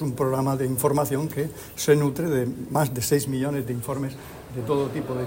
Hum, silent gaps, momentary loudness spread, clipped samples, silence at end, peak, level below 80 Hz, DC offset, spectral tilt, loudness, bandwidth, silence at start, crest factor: none; none; 9 LU; under 0.1%; 0 s; -6 dBFS; -52 dBFS; under 0.1%; -6 dB/octave; -25 LUFS; 16.5 kHz; 0 s; 20 dB